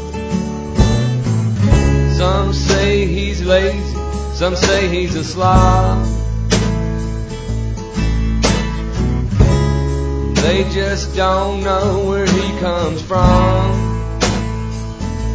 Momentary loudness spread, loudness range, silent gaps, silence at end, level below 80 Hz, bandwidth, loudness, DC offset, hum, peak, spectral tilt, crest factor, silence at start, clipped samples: 9 LU; 2 LU; none; 0 s; -20 dBFS; 8 kHz; -16 LUFS; under 0.1%; none; 0 dBFS; -5.5 dB/octave; 14 dB; 0 s; under 0.1%